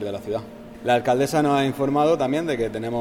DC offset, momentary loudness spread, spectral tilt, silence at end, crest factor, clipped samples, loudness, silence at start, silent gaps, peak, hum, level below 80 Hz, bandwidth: under 0.1%; 11 LU; -6 dB/octave; 0 s; 16 dB; under 0.1%; -22 LUFS; 0 s; none; -6 dBFS; none; -52 dBFS; 17 kHz